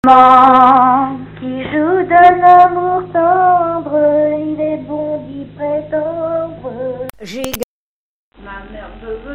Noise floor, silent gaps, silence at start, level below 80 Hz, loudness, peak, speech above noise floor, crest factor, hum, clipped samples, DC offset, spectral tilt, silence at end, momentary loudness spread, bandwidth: under -90 dBFS; 7.64-8.32 s; 0.05 s; -44 dBFS; -11 LUFS; 0 dBFS; over 81 dB; 12 dB; none; 0.2%; under 0.1%; -6 dB/octave; 0 s; 22 LU; 16.5 kHz